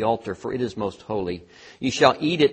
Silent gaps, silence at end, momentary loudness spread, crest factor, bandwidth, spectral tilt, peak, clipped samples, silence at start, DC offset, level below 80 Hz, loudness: none; 0 s; 12 LU; 24 dB; 8.4 kHz; -5 dB/octave; 0 dBFS; under 0.1%; 0 s; under 0.1%; -56 dBFS; -24 LUFS